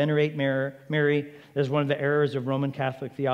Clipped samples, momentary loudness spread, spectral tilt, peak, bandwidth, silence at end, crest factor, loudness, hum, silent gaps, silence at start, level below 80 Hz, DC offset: under 0.1%; 6 LU; -8 dB/octave; -10 dBFS; 7.2 kHz; 0 s; 16 dB; -26 LUFS; none; none; 0 s; -76 dBFS; under 0.1%